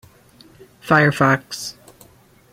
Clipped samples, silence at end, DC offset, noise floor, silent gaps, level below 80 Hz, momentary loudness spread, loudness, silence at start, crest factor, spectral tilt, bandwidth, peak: under 0.1%; 0.8 s; under 0.1%; -51 dBFS; none; -56 dBFS; 17 LU; -17 LUFS; 0.85 s; 20 dB; -5.5 dB/octave; 16 kHz; 0 dBFS